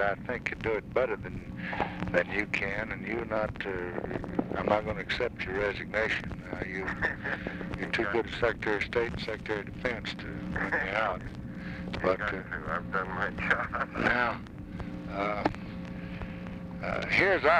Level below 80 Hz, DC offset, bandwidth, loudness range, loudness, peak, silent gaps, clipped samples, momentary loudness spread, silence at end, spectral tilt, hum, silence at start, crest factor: -48 dBFS; under 0.1%; 11.5 kHz; 2 LU; -32 LUFS; -10 dBFS; none; under 0.1%; 11 LU; 0 s; -6 dB/octave; none; 0 s; 22 dB